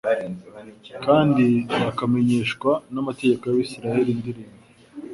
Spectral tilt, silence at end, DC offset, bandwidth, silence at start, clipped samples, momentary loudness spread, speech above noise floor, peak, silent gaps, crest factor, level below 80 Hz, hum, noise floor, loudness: -7 dB/octave; 0 s; under 0.1%; 11.5 kHz; 0.05 s; under 0.1%; 18 LU; 19 dB; -4 dBFS; none; 18 dB; -58 dBFS; none; -40 dBFS; -22 LUFS